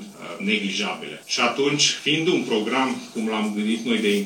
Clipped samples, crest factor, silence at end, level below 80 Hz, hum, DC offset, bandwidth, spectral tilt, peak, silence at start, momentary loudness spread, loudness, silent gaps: under 0.1%; 18 dB; 0 s; -82 dBFS; none; under 0.1%; 17.5 kHz; -3 dB/octave; -6 dBFS; 0 s; 9 LU; -22 LUFS; none